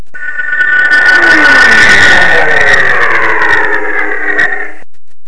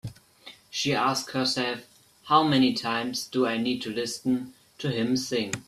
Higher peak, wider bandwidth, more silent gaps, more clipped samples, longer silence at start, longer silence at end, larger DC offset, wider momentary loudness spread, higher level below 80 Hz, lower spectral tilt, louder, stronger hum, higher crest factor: first, 0 dBFS vs -6 dBFS; second, 11 kHz vs 14 kHz; neither; first, 5% vs under 0.1%; about the same, 0 s vs 0.05 s; about the same, 0 s vs 0.05 s; first, 30% vs under 0.1%; about the same, 11 LU vs 10 LU; first, -34 dBFS vs -64 dBFS; second, -2.5 dB/octave vs -4 dB/octave; first, -5 LUFS vs -26 LUFS; neither; second, 10 dB vs 20 dB